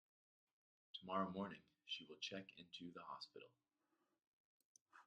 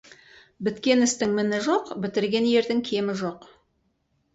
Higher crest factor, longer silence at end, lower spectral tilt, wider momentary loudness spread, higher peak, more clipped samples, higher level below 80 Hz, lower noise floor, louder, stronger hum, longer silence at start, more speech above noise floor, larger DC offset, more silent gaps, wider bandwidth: first, 26 dB vs 16 dB; second, 0.05 s vs 0.95 s; about the same, -4.5 dB/octave vs -4 dB/octave; first, 14 LU vs 10 LU; second, -28 dBFS vs -8 dBFS; neither; second, under -90 dBFS vs -64 dBFS; first, -88 dBFS vs -71 dBFS; second, -51 LUFS vs -24 LUFS; neither; first, 0.95 s vs 0.6 s; second, 37 dB vs 47 dB; neither; first, 4.27-4.75 s, 4.81-4.86 s vs none; about the same, 9 kHz vs 8.2 kHz